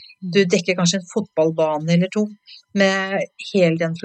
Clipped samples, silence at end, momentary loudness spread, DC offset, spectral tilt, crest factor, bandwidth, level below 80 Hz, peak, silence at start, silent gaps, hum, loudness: under 0.1%; 0.05 s; 7 LU; under 0.1%; -5 dB/octave; 18 dB; 8.8 kHz; -76 dBFS; -2 dBFS; 0 s; none; none; -20 LUFS